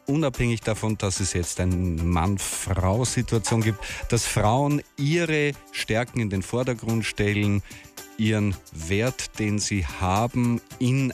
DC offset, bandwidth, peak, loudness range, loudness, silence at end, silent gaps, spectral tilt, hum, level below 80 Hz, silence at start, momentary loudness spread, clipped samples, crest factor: under 0.1%; 15.5 kHz; -10 dBFS; 2 LU; -25 LUFS; 0 s; none; -5 dB/octave; none; -42 dBFS; 0.1 s; 5 LU; under 0.1%; 14 dB